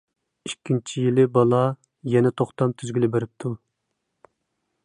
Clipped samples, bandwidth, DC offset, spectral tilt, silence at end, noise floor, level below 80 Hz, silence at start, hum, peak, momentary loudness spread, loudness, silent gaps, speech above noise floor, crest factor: under 0.1%; 11 kHz; under 0.1%; -7 dB/octave; 1.3 s; -78 dBFS; -64 dBFS; 0.45 s; none; -4 dBFS; 16 LU; -22 LUFS; none; 56 dB; 18 dB